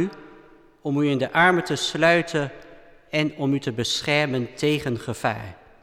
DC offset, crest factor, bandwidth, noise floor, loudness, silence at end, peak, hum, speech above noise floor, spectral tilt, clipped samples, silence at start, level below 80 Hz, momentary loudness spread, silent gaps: under 0.1%; 18 dB; 15 kHz; -51 dBFS; -23 LUFS; 0.25 s; -6 dBFS; none; 28 dB; -5 dB/octave; under 0.1%; 0 s; -56 dBFS; 10 LU; none